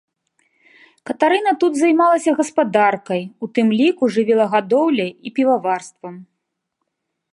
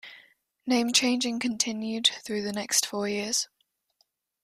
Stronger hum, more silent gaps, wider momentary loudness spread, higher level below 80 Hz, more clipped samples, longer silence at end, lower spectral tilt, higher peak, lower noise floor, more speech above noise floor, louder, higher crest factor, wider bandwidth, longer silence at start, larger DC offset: neither; neither; about the same, 10 LU vs 9 LU; about the same, -74 dBFS vs -72 dBFS; neither; about the same, 1.1 s vs 1 s; first, -5 dB/octave vs -1.5 dB/octave; first, -2 dBFS vs -8 dBFS; first, -76 dBFS vs -72 dBFS; first, 59 dB vs 45 dB; first, -17 LUFS vs -26 LUFS; second, 16 dB vs 22 dB; second, 11.5 kHz vs 15.5 kHz; first, 1.05 s vs 0.05 s; neither